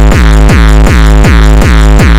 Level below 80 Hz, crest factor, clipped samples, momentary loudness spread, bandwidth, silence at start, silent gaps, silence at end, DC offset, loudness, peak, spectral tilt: -4 dBFS; 2 dB; 5%; 1 LU; 12.5 kHz; 0 s; none; 0 s; under 0.1%; -5 LUFS; 0 dBFS; -6 dB/octave